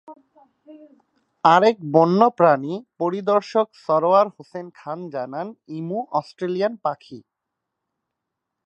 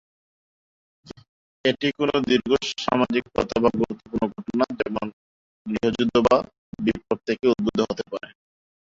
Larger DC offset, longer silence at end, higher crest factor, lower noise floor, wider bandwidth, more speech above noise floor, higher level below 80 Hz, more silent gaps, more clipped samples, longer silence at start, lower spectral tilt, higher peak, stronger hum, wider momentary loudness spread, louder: neither; first, 1.45 s vs 0.55 s; about the same, 22 dB vs 20 dB; second, -82 dBFS vs under -90 dBFS; about the same, 8.2 kHz vs 7.8 kHz; second, 61 dB vs over 67 dB; second, -76 dBFS vs -52 dBFS; second, none vs 1.29-1.64 s, 5.13-5.65 s, 6.58-6.73 s; neither; second, 0.1 s vs 1.05 s; first, -7 dB/octave vs -5.5 dB/octave; first, 0 dBFS vs -4 dBFS; neither; first, 17 LU vs 11 LU; first, -20 LUFS vs -23 LUFS